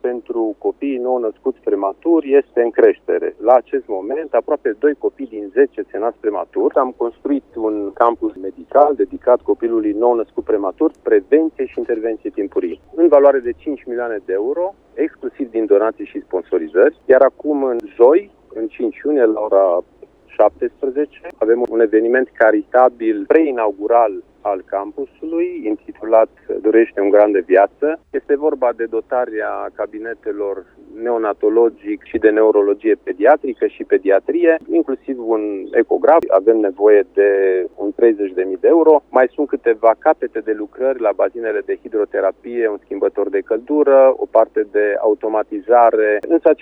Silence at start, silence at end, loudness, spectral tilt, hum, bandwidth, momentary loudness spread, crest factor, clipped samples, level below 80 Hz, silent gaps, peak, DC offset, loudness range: 0.05 s; 0.05 s; -16 LUFS; -8 dB/octave; none; 3.8 kHz; 11 LU; 16 dB; under 0.1%; -56 dBFS; none; 0 dBFS; under 0.1%; 4 LU